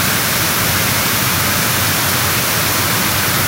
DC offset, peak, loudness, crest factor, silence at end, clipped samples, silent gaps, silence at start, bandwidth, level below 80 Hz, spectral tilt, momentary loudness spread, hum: under 0.1%; -2 dBFS; -13 LUFS; 14 dB; 0 s; under 0.1%; none; 0 s; 16.5 kHz; -40 dBFS; -2 dB/octave; 0 LU; none